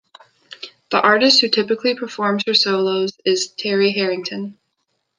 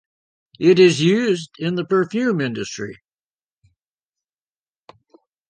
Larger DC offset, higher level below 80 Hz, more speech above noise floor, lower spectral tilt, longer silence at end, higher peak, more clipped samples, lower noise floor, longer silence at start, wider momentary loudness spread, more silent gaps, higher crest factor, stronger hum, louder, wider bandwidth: neither; about the same, -70 dBFS vs -66 dBFS; second, 54 dB vs over 72 dB; second, -3.5 dB/octave vs -5.5 dB/octave; second, 0.65 s vs 2.55 s; about the same, 0 dBFS vs -2 dBFS; neither; second, -72 dBFS vs under -90 dBFS; about the same, 0.5 s vs 0.6 s; about the same, 17 LU vs 15 LU; neither; about the same, 18 dB vs 18 dB; neither; about the same, -17 LUFS vs -18 LUFS; about the same, 9.8 kHz vs 9.6 kHz